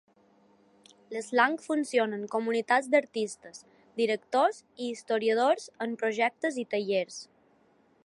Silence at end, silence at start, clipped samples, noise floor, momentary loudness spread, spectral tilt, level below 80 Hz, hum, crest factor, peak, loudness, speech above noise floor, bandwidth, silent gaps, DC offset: 0.8 s; 1.1 s; under 0.1%; -65 dBFS; 13 LU; -3.5 dB/octave; -84 dBFS; none; 20 dB; -10 dBFS; -29 LUFS; 36 dB; 11.5 kHz; none; under 0.1%